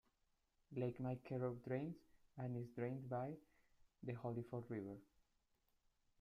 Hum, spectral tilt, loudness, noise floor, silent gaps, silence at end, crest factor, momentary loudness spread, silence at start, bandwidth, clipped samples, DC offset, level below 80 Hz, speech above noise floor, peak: none; -10 dB/octave; -48 LUFS; -84 dBFS; none; 1.15 s; 18 dB; 10 LU; 0.7 s; 5.8 kHz; under 0.1%; under 0.1%; -78 dBFS; 37 dB; -32 dBFS